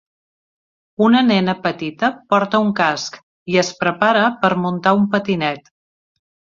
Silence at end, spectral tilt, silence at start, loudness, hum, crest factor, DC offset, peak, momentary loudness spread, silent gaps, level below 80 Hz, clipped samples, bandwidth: 1 s; -5.5 dB/octave; 1 s; -17 LUFS; none; 18 dB; under 0.1%; -2 dBFS; 9 LU; 3.23-3.46 s; -60 dBFS; under 0.1%; 7.6 kHz